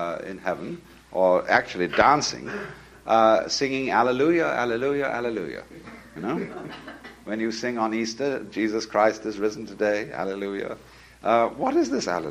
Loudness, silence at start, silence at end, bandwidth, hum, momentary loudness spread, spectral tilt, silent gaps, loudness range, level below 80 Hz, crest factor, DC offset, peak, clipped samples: -24 LUFS; 0 s; 0 s; 13.5 kHz; none; 18 LU; -4.5 dB/octave; none; 8 LU; -58 dBFS; 22 dB; under 0.1%; -2 dBFS; under 0.1%